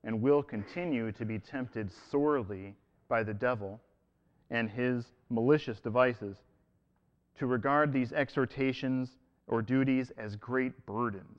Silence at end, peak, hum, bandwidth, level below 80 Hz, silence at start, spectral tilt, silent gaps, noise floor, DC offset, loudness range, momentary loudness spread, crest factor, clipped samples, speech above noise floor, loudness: 0.05 s; -12 dBFS; none; 7.2 kHz; -64 dBFS; 0.05 s; -8.5 dB/octave; none; -73 dBFS; under 0.1%; 3 LU; 12 LU; 20 dB; under 0.1%; 41 dB; -32 LUFS